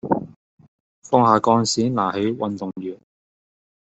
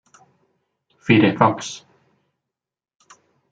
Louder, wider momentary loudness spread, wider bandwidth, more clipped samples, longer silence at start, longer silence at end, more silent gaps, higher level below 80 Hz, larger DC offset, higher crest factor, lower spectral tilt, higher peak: second, -20 LUFS vs -17 LUFS; about the same, 16 LU vs 18 LU; about the same, 8.2 kHz vs 9 kHz; neither; second, 0.05 s vs 1.05 s; second, 0.9 s vs 1.75 s; first, 0.36-0.58 s, 0.68-1.02 s vs none; about the same, -62 dBFS vs -58 dBFS; neither; about the same, 20 dB vs 22 dB; about the same, -5.5 dB/octave vs -6 dB/octave; about the same, -2 dBFS vs -2 dBFS